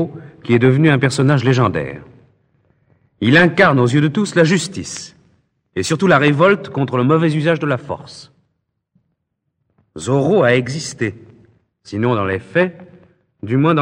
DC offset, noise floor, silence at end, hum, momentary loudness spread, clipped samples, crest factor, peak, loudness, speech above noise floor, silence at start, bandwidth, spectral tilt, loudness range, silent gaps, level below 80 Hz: under 0.1%; -72 dBFS; 0 s; none; 17 LU; under 0.1%; 16 dB; 0 dBFS; -15 LUFS; 57 dB; 0 s; 10.5 kHz; -6 dB/octave; 5 LU; none; -54 dBFS